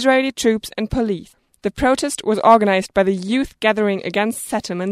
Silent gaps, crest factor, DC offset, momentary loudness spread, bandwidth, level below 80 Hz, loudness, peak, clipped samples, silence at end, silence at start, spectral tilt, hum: none; 18 dB; under 0.1%; 10 LU; 14.5 kHz; -42 dBFS; -18 LUFS; 0 dBFS; under 0.1%; 0 s; 0 s; -4.5 dB/octave; none